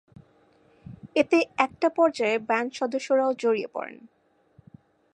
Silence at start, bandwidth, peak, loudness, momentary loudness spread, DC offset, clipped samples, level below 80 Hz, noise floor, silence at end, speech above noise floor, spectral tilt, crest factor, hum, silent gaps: 0.9 s; 10.5 kHz; -6 dBFS; -25 LUFS; 12 LU; under 0.1%; under 0.1%; -68 dBFS; -61 dBFS; 1.05 s; 36 dB; -4.5 dB/octave; 22 dB; none; none